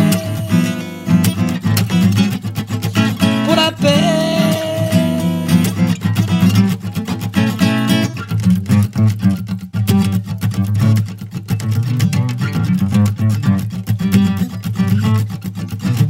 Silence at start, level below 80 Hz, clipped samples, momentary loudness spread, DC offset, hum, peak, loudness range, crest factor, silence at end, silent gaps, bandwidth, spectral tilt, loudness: 0 s; -46 dBFS; under 0.1%; 8 LU; under 0.1%; none; 0 dBFS; 2 LU; 14 dB; 0 s; none; 16.5 kHz; -6.5 dB/octave; -16 LUFS